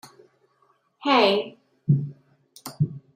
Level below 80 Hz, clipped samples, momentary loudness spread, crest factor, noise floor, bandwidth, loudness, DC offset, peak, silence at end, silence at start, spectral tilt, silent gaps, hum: -68 dBFS; under 0.1%; 20 LU; 22 dB; -65 dBFS; 15 kHz; -23 LUFS; under 0.1%; -4 dBFS; 0.15 s; 1.05 s; -6.5 dB/octave; none; none